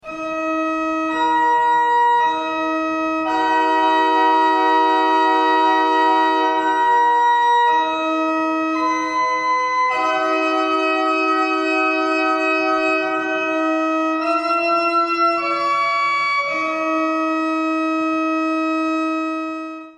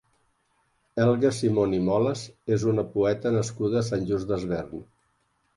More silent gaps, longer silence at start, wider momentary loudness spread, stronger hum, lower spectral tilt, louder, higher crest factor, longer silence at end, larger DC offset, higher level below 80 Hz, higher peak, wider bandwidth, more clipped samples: neither; second, 0.05 s vs 0.95 s; second, 5 LU vs 9 LU; neither; second, -3 dB/octave vs -7 dB/octave; first, -18 LUFS vs -26 LUFS; about the same, 12 dB vs 16 dB; second, 0.05 s vs 0.75 s; neither; second, -62 dBFS vs -54 dBFS; first, -6 dBFS vs -10 dBFS; second, 9.4 kHz vs 11.5 kHz; neither